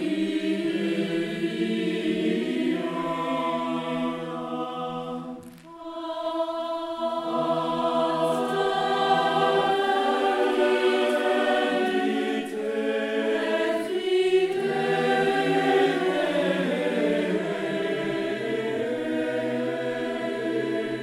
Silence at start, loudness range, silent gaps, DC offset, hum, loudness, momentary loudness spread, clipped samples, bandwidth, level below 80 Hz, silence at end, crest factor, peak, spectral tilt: 0 s; 7 LU; none; under 0.1%; none; -25 LUFS; 8 LU; under 0.1%; 13.5 kHz; -68 dBFS; 0 s; 16 dB; -10 dBFS; -5.5 dB/octave